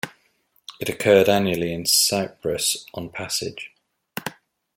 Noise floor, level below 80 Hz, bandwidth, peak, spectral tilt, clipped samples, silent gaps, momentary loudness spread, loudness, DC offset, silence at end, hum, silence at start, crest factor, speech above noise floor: -65 dBFS; -58 dBFS; 16.5 kHz; -2 dBFS; -3 dB/octave; under 0.1%; none; 19 LU; -21 LUFS; under 0.1%; 0.45 s; none; 0.05 s; 20 dB; 43 dB